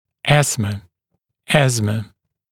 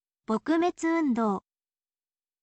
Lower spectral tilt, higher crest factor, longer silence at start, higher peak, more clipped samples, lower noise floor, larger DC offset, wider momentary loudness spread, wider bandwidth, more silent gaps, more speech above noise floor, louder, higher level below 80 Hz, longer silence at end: second, -4.5 dB/octave vs -6 dB/octave; about the same, 20 dB vs 16 dB; about the same, 0.25 s vs 0.3 s; first, 0 dBFS vs -14 dBFS; neither; second, -74 dBFS vs under -90 dBFS; neither; first, 13 LU vs 6 LU; first, 16.5 kHz vs 8.8 kHz; neither; second, 57 dB vs over 64 dB; first, -18 LUFS vs -28 LUFS; first, -50 dBFS vs -70 dBFS; second, 0.45 s vs 1.05 s